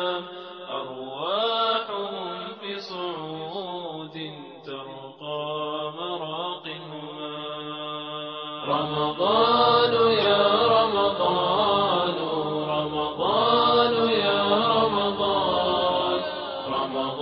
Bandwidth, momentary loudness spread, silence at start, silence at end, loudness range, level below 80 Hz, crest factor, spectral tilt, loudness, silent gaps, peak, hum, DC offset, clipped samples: 6 kHz; 15 LU; 0 s; 0 s; 12 LU; -58 dBFS; 18 dB; -7 dB/octave; -24 LUFS; none; -6 dBFS; none; under 0.1%; under 0.1%